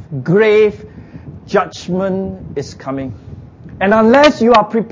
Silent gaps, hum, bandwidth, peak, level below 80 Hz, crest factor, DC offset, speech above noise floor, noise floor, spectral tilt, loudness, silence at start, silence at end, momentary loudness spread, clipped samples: none; none; 7.6 kHz; 0 dBFS; -42 dBFS; 14 dB; under 0.1%; 20 dB; -33 dBFS; -6 dB/octave; -13 LUFS; 0 s; 0 s; 24 LU; under 0.1%